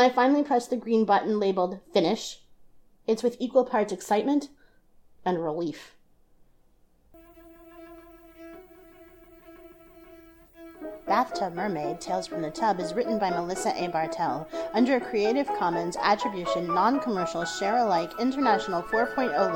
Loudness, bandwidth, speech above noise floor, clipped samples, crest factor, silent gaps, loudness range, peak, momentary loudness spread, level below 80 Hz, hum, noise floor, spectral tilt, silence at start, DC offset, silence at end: -26 LUFS; 19 kHz; 35 dB; under 0.1%; 18 dB; none; 10 LU; -8 dBFS; 12 LU; -60 dBFS; none; -61 dBFS; -5 dB/octave; 0 s; under 0.1%; 0 s